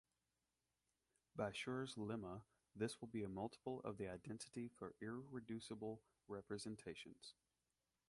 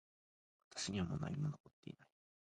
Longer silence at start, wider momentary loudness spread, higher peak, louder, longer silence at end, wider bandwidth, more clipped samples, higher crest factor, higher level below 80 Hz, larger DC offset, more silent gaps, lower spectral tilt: first, 1.35 s vs 0.75 s; second, 11 LU vs 16 LU; about the same, -30 dBFS vs -28 dBFS; second, -51 LUFS vs -44 LUFS; first, 0.8 s vs 0.4 s; about the same, 11.5 kHz vs 11 kHz; neither; about the same, 22 dB vs 18 dB; second, -78 dBFS vs -64 dBFS; neither; second, none vs 1.60-1.64 s, 1.73-1.83 s; about the same, -5.5 dB/octave vs -5 dB/octave